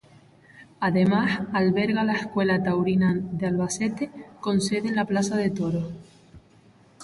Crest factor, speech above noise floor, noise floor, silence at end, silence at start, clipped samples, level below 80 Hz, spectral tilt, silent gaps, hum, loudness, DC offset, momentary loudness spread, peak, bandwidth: 14 dB; 32 dB; -55 dBFS; 0 s; 0.55 s; under 0.1%; -56 dBFS; -6 dB/octave; none; none; -24 LUFS; under 0.1%; 8 LU; -10 dBFS; 11.5 kHz